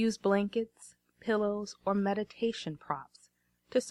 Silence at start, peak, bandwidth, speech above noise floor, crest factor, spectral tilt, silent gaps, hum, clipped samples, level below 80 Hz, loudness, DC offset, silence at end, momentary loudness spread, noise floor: 0 s; -14 dBFS; 12 kHz; 37 dB; 18 dB; -5.5 dB/octave; none; 60 Hz at -60 dBFS; under 0.1%; -70 dBFS; -33 LUFS; under 0.1%; 0 s; 10 LU; -69 dBFS